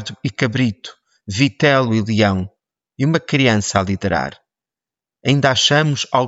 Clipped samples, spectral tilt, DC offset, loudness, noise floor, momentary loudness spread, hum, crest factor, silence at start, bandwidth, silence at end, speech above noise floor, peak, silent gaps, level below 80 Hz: under 0.1%; -5 dB/octave; under 0.1%; -17 LUFS; -89 dBFS; 12 LU; none; 16 dB; 0 s; 8 kHz; 0 s; 72 dB; -2 dBFS; none; -52 dBFS